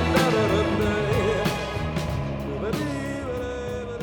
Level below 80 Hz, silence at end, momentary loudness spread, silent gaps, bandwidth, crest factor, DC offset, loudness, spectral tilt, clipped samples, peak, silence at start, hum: -38 dBFS; 0 s; 9 LU; none; 19.5 kHz; 16 dB; under 0.1%; -25 LUFS; -6 dB/octave; under 0.1%; -8 dBFS; 0 s; none